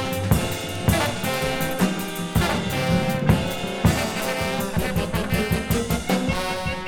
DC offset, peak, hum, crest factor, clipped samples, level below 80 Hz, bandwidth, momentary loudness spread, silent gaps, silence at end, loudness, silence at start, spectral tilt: under 0.1%; -4 dBFS; none; 18 dB; under 0.1%; -34 dBFS; 19 kHz; 3 LU; none; 0 s; -23 LUFS; 0 s; -5 dB/octave